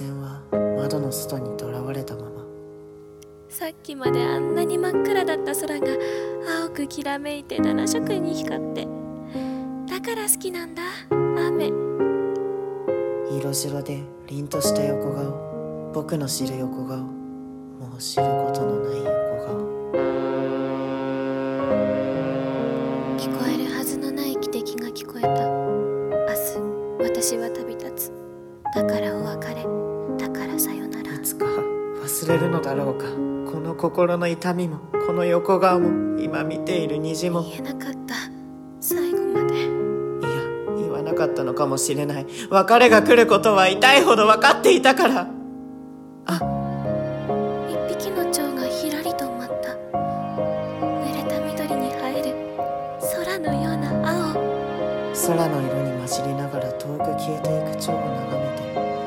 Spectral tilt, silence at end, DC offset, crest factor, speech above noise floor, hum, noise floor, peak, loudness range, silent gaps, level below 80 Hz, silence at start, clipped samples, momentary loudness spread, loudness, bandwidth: -4.5 dB/octave; 0 s; under 0.1%; 22 dB; 23 dB; none; -44 dBFS; 0 dBFS; 9 LU; none; -56 dBFS; 0 s; under 0.1%; 12 LU; -23 LUFS; 17 kHz